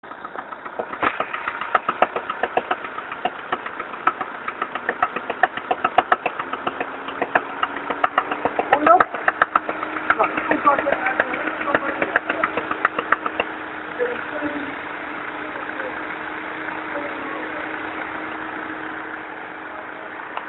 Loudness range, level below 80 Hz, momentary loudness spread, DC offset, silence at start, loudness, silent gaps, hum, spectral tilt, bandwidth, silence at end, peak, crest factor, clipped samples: 9 LU; -60 dBFS; 11 LU; under 0.1%; 0.05 s; -23 LUFS; none; none; -6.5 dB/octave; 4.2 kHz; 0 s; 0 dBFS; 24 dB; under 0.1%